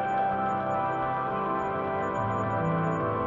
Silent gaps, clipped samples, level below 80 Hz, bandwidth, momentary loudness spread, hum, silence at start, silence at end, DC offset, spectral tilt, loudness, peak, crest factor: none; under 0.1%; -56 dBFS; 7.4 kHz; 2 LU; none; 0 s; 0 s; under 0.1%; -8 dB/octave; -28 LUFS; -16 dBFS; 12 dB